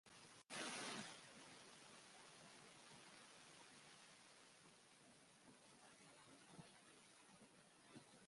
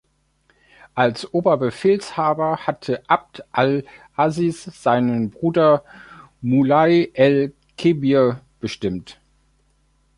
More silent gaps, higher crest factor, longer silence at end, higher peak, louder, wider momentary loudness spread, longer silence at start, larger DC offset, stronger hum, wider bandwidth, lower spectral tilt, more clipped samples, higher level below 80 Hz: neither; first, 26 dB vs 18 dB; second, 0 s vs 1.05 s; second, -36 dBFS vs -2 dBFS; second, -59 LUFS vs -19 LUFS; first, 16 LU vs 11 LU; second, 0.05 s vs 0.95 s; neither; neither; about the same, 11.5 kHz vs 11.5 kHz; second, -2 dB/octave vs -7 dB/octave; neither; second, under -90 dBFS vs -56 dBFS